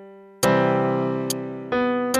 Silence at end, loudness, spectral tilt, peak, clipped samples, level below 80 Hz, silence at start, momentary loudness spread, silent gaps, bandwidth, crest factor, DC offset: 0 s; -22 LUFS; -5 dB/octave; -6 dBFS; under 0.1%; -58 dBFS; 0 s; 8 LU; none; 15.5 kHz; 16 dB; under 0.1%